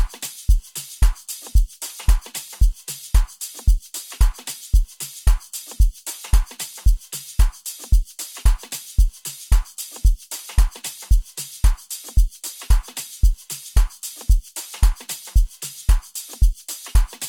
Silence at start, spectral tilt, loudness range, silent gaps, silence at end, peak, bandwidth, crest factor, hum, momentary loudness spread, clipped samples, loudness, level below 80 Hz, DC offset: 0 s; -3.5 dB/octave; 1 LU; none; 0 s; -4 dBFS; 18 kHz; 16 dB; none; 9 LU; under 0.1%; -24 LUFS; -20 dBFS; under 0.1%